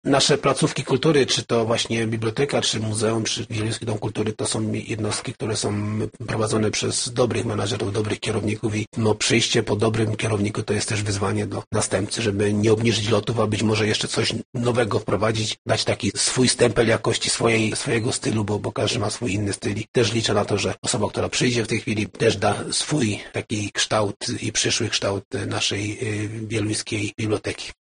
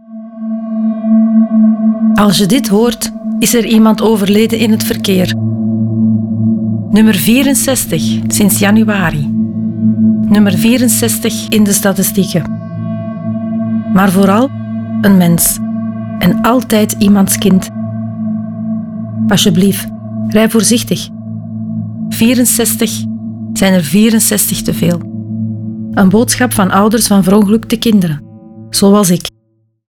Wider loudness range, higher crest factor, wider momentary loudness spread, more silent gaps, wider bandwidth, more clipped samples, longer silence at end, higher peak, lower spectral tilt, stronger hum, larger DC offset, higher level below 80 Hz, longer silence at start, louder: about the same, 3 LU vs 3 LU; first, 18 dB vs 10 dB; second, 7 LU vs 11 LU; first, 8.87-8.92 s, 11.67-11.71 s, 14.45-14.53 s, 15.58-15.65 s, 19.88-19.94 s, 20.78-20.82 s, 24.16-24.20 s, 25.25-25.31 s vs none; second, 10 kHz vs 19.5 kHz; neither; second, 0.15 s vs 0.7 s; second, -4 dBFS vs 0 dBFS; about the same, -4 dB/octave vs -5 dB/octave; neither; neither; second, -50 dBFS vs -40 dBFS; about the same, 0.05 s vs 0.1 s; second, -22 LUFS vs -11 LUFS